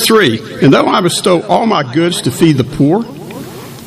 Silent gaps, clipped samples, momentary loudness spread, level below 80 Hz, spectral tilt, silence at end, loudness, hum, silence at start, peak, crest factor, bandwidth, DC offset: none; 0.4%; 17 LU; -44 dBFS; -5 dB/octave; 0 s; -11 LUFS; none; 0 s; 0 dBFS; 12 dB; 15.5 kHz; under 0.1%